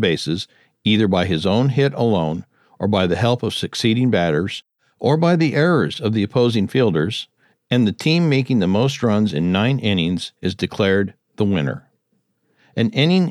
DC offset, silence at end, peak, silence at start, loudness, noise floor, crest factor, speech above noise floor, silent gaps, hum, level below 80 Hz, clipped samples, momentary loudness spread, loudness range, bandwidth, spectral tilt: under 0.1%; 0 s; -2 dBFS; 0 s; -19 LUFS; -68 dBFS; 16 dB; 50 dB; none; none; -54 dBFS; under 0.1%; 9 LU; 2 LU; 12.5 kHz; -6.5 dB/octave